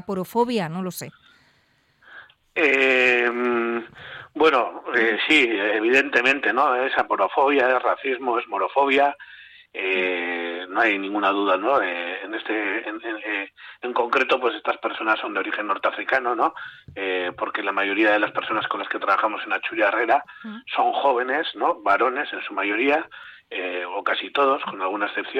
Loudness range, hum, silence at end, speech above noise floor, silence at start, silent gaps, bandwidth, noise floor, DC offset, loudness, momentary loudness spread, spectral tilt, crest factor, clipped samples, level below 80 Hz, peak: 5 LU; none; 0 s; 41 dB; 0.1 s; none; 16 kHz; -63 dBFS; under 0.1%; -22 LUFS; 12 LU; -4.5 dB/octave; 18 dB; under 0.1%; -68 dBFS; -6 dBFS